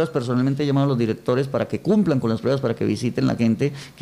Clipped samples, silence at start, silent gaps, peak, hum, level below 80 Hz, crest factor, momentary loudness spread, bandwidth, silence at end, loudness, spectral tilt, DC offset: under 0.1%; 0 s; none; -8 dBFS; none; -54 dBFS; 12 dB; 4 LU; 12.5 kHz; 0.1 s; -21 LUFS; -7.5 dB/octave; under 0.1%